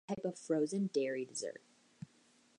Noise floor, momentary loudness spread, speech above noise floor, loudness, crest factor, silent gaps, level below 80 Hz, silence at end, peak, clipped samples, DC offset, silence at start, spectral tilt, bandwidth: -69 dBFS; 20 LU; 32 dB; -38 LUFS; 16 dB; none; -82 dBFS; 1.05 s; -22 dBFS; under 0.1%; under 0.1%; 0.1 s; -5 dB/octave; 11 kHz